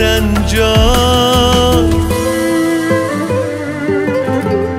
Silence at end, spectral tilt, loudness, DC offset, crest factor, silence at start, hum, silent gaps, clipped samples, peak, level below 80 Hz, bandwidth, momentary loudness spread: 0 s; -5 dB/octave; -12 LUFS; 0.1%; 12 dB; 0 s; none; none; under 0.1%; 0 dBFS; -20 dBFS; 16.5 kHz; 6 LU